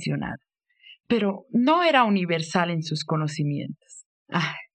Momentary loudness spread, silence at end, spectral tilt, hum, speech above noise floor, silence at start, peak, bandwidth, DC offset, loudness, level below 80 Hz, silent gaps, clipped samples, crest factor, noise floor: 14 LU; 0.1 s; -6 dB/octave; none; 30 dB; 0 s; -4 dBFS; 9.4 kHz; under 0.1%; -24 LUFS; -62 dBFS; 4.05-4.26 s; under 0.1%; 20 dB; -54 dBFS